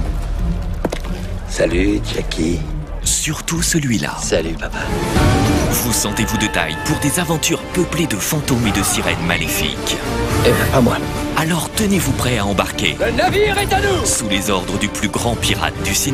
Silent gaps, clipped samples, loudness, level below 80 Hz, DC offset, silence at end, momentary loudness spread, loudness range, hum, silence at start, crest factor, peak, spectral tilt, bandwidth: none; under 0.1%; -17 LUFS; -26 dBFS; under 0.1%; 0 s; 8 LU; 2 LU; none; 0 s; 18 dB; 0 dBFS; -4 dB/octave; 15.5 kHz